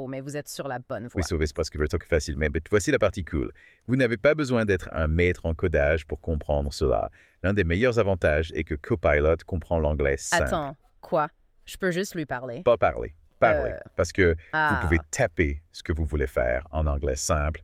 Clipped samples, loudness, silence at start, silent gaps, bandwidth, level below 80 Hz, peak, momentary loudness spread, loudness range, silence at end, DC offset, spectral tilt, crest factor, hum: under 0.1%; -26 LUFS; 0 s; none; 15.5 kHz; -36 dBFS; -6 dBFS; 10 LU; 3 LU; 0 s; under 0.1%; -5.5 dB/octave; 20 dB; none